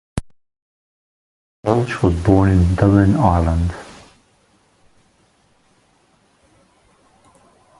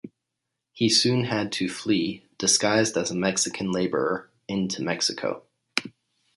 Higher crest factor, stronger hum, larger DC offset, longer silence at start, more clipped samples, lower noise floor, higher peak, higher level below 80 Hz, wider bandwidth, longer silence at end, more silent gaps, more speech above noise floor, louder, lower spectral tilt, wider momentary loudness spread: about the same, 20 dB vs 24 dB; neither; neither; about the same, 0.15 s vs 0.05 s; neither; second, -58 dBFS vs -83 dBFS; about the same, 0 dBFS vs -2 dBFS; first, -30 dBFS vs -64 dBFS; about the same, 11.5 kHz vs 11.5 kHz; first, 3.95 s vs 0.5 s; first, 0.62-1.63 s vs none; second, 44 dB vs 58 dB; first, -16 LUFS vs -24 LUFS; first, -8.5 dB/octave vs -3 dB/octave; first, 17 LU vs 11 LU